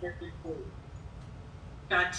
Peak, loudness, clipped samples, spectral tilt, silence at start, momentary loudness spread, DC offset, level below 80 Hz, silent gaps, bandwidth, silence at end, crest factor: -16 dBFS; -38 LUFS; under 0.1%; -4 dB/octave; 0 s; 18 LU; under 0.1%; -50 dBFS; none; 10 kHz; 0 s; 22 dB